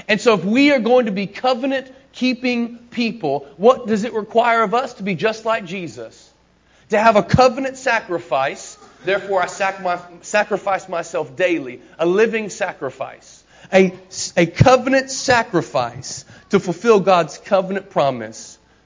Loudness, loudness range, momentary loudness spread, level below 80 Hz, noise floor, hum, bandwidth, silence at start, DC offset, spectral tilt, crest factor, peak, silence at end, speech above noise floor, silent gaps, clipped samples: -18 LUFS; 4 LU; 15 LU; -48 dBFS; -55 dBFS; none; 7.6 kHz; 0.1 s; under 0.1%; -5 dB/octave; 18 dB; 0 dBFS; 0.3 s; 37 dB; none; under 0.1%